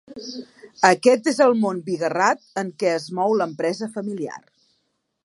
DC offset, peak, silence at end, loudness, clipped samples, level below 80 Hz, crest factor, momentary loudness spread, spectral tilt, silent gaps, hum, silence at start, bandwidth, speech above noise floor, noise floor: under 0.1%; 0 dBFS; 0.85 s; -21 LUFS; under 0.1%; -74 dBFS; 22 dB; 17 LU; -4.5 dB/octave; none; none; 0.1 s; 11.5 kHz; 51 dB; -72 dBFS